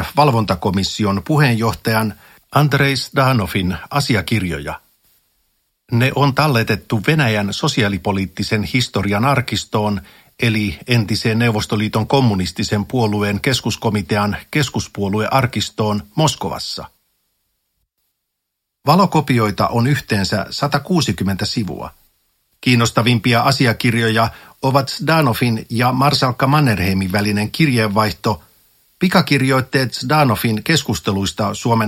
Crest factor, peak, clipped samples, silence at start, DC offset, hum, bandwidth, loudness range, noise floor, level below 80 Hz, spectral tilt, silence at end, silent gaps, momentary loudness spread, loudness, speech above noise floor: 18 dB; 0 dBFS; under 0.1%; 0 s; under 0.1%; none; 16.5 kHz; 4 LU; -77 dBFS; -44 dBFS; -5.5 dB/octave; 0 s; none; 7 LU; -17 LUFS; 60 dB